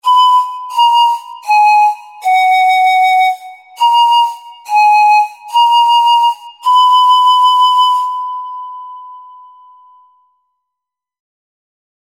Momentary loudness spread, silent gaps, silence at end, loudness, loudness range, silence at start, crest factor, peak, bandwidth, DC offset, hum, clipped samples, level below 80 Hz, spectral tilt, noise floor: 13 LU; none; 2.8 s; -10 LUFS; 7 LU; 0.05 s; 10 dB; 0 dBFS; 16 kHz; under 0.1%; none; under 0.1%; -74 dBFS; 3.5 dB/octave; -81 dBFS